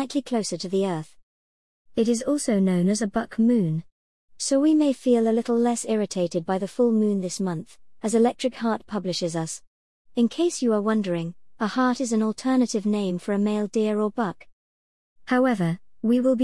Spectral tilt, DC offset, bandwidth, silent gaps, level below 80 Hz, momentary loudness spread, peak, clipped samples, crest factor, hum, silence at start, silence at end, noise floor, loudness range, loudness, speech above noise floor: -5.5 dB/octave; 0.3%; 12 kHz; 1.23-1.85 s, 3.92-4.28 s, 9.67-10.05 s, 14.53-15.16 s; -62 dBFS; 9 LU; -10 dBFS; under 0.1%; 14 dB; none; 0 s; 0 s; under -90 dBFS; 3 LU; -24 LUFS; over 67 dB